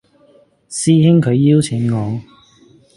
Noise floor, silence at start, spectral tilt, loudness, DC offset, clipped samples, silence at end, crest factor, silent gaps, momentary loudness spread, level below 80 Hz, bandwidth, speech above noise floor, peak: -51 dBFS; 0.7 s; -6.5 dB/octave; -14 LUFS; under 0.1%; under 0.1%; 0.75 s; 16 dB; none; 14 LU; -52 dBFS; 11.5 kHz; 38 dB; 0 dBFS